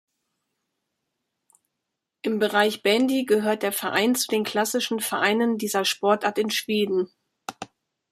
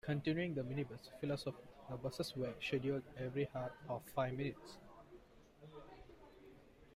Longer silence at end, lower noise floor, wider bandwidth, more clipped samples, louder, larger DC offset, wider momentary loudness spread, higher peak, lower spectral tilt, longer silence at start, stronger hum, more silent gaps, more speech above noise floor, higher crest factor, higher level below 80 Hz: first, 0.45 s vs 0 s; first, -83 dBFS vs -62 dBFS; about the same, 15.5 kHz vs 16 kHz; neither; first, -23 LUFS vs -43 LUFS; neither; second, 14 LU vs 22 LU; first, -4 dBFS vs -26 dBFS; second, -3 dB/octave vs -6.5 dB/octave; first, 2.25 s vs 0.05 s; neither; neither; first, 60 dB vs 20 dB; about the same, 20 dB vs 18 dB; about the same, -72 dBFS vs -68 dBFS